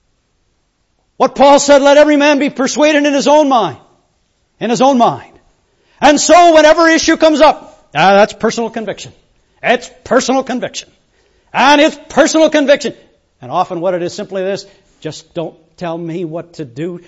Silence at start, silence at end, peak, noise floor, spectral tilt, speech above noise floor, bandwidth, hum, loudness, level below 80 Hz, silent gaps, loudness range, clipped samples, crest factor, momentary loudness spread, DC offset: 1.2 s; 0.1 s; 0 dBFS; -61 dBFS; -3.5 dB/octave; 50 dB; 8 kHz; none; -11 LUFS; -46 dBFS; none; 9 LU; 0.1%; 12 dB; 18 LU; under 0.1%